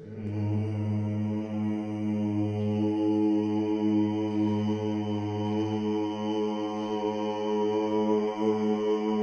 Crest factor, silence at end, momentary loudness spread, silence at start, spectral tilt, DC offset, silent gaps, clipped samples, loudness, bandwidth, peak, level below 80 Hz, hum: 14 dB; 0 s; 5 LU; 0 s; -8.5 dB/octave; under 0.1%; none; under 0.1%; -29 LUFS; 6.8 kHz; -14 dBFS; -70 dBFS; none